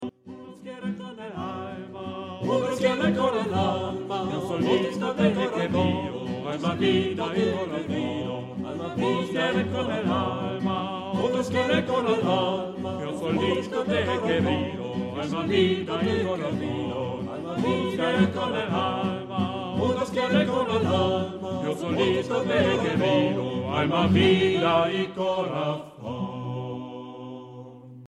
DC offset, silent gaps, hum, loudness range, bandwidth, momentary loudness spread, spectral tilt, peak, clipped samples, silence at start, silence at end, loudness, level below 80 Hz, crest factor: under 0.1%; none; none; 4 LU; 11.5 kHz; 11 LU; -6.5 dB/octave; -8 dBFS; under 0.1%; 0 s; 0 s; -26 LUFS; -58 dBFS; 18 dB